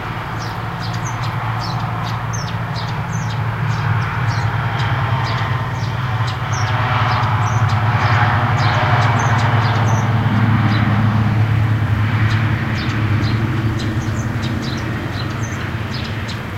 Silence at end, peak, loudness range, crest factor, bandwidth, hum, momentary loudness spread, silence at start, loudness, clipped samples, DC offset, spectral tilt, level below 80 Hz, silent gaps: 0 s; -2 dBFS; 6 LU; 16 dB; 8.2 kHz; none; 8 LU; 0 s; -18 LUFS; under 0.1%; under 0.1%; -6 dB/octave; -34 dBFS; none